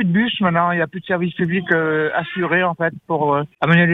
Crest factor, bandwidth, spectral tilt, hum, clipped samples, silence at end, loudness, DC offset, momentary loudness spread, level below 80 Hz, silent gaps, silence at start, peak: 16 dB; 4 kHz; -9 dB/octave; none; under 0.1%; 0 s; -18 LUFS; under 0.1%; 5 LU; -56 dBFS; none; 0 s; -2 dBFS